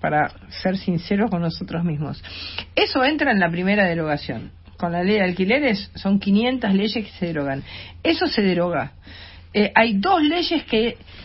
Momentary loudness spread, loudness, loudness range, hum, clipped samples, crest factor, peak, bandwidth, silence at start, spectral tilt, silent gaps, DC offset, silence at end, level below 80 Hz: 12 LU; -21 LUFS; 2 LU; none; under 0.1%; 22 dB; 0 dBFS; 5.8 kHz; 0 s; -9.5 dB/octave; none; under 0.1%; 0 s; -46 dBFS